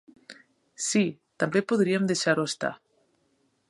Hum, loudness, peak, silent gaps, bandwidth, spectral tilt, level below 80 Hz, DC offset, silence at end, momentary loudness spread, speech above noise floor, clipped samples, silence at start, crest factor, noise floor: none; -26 LUFS; -10 dBFS; none; 11.5 kHz; -4.5 dB/octave; -74 dBFS; under 0.1%; 0.95 s; 8 LU; 45 dB; under 0.1%; 0.3 s; 20 dB; -70 dBFS